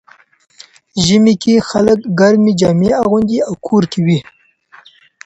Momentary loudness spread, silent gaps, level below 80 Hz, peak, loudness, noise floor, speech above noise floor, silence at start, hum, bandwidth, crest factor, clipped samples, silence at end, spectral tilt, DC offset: 6 LU; none; -46 dBFS; 0 dBFS; -12 LUFS; -45 dBFS; 34 dB; 0.95 s; none; 8.2 kHz; 14 dB; under 0.1%; 1.05 s; -6 dB/octave; under 0.1%